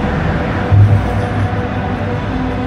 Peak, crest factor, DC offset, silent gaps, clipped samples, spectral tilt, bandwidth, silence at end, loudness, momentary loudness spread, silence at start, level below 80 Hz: 0 dBFS; 14 dB; under 0.1%; none; under 0.1%; -8.5 dB/octave; 6.6 kHz; 0 s; -15 LUFS; 8 LU; 0 s; -24 dBFS